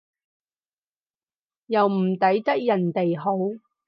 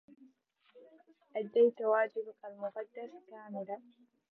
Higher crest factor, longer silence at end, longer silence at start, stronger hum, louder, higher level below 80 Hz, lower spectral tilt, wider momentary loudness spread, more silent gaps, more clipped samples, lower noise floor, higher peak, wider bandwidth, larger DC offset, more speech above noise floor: about the same, 18 dB vs 20 dB; second, 0.3 s vs 0.5 s; first, 1.7 s vs 0.75 s; neither; first, -23 LUFS vs -34 LUFS; first, -78 dBFS vs under -90 dBFS; first, -9.5 dB/octave vs -8 dB/octave; second, 6 LU vs 19 LU; neither; neither; first, under -90 dBFS vs -70 dBFS; first, -8 dBFS vs -16 dBFS; first, 5.6 kHz vs 4.1 kHz; neither; first, over 68 dB vs 35 dB